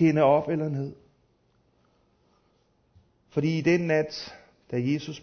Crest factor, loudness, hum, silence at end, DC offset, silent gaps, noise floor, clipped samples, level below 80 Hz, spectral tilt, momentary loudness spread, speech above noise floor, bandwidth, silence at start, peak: 20 dB; -26 LUFS; none; 0 s; under 0.1%; none; -67 dBFS; under 0.1%; -66 dBFS; -7 dB/octave; 14 LU; 43 dB; 6.6 kHz; 0 s; -8 dBFS